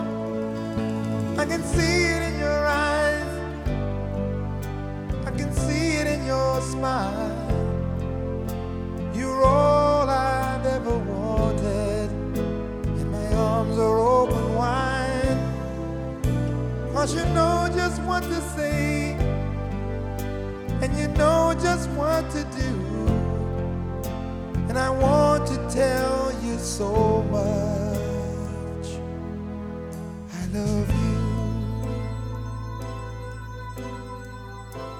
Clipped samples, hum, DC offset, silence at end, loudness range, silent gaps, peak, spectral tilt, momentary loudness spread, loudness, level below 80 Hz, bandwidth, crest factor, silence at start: under 0.1%; none; under 0.1%; 0 s; 5 LU; none; -6 dBFS; -6 dB/octave; 12 LU; -25 LUFS; -34 dBFS; 19 kHz; 18 dB; 0 s